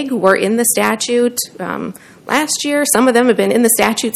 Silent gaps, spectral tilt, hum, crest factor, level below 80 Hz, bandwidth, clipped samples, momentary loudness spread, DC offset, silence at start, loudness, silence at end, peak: none; -3 dB/octave; none; 14 dB; -56 dBFS; 16.5 kHz; 0.2%; 12 LU; under 0.1%; 0 s; -14 LUFS; 0 s; 0 dBFS